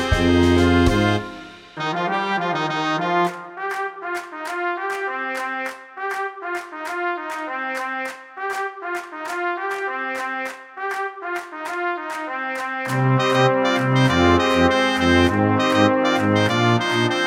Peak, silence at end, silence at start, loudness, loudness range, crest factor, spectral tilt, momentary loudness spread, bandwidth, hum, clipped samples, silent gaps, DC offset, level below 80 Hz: -2 dBFS; 0 s; 0 s; -21 LUFS; 9 LU; 18 dB; -5.5 dB/octave; 12 LU; 16 kHz; none; under 0.1%; none; under 0.1%; -38 dBFS